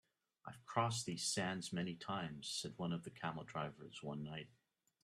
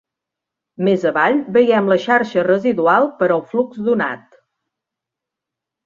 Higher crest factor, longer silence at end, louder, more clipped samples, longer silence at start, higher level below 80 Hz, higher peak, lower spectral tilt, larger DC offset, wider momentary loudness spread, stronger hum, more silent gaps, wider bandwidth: first, 24 dB vs 16 dB; second, 0.55 s vs 1.7 s; second, -43 LUFS vs -16 LUFS; neither; second, 0.45 s vs 0.8 s; second, -78 dBFS vs -64 dBFS; second, -22 dBFS vs -2 dBFS; second, -4 dB/octave vs -7 dB/octave; neither; first, 13 LU vs 6 LU; neither; neither; first, 13 kHz vs 7.2 kHz